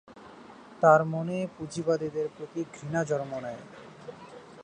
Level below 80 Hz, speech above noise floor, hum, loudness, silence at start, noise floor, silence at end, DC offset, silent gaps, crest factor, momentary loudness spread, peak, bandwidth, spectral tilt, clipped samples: -68 dBFS; 21 dB; none; -28 LUFS; 0.1 s; -49 dBFS; 0 s; under 0.1%; none; 22 dB; 26 LU; -8 dBFS; 10 kHz; -6.5 dB/octave; under 0.1%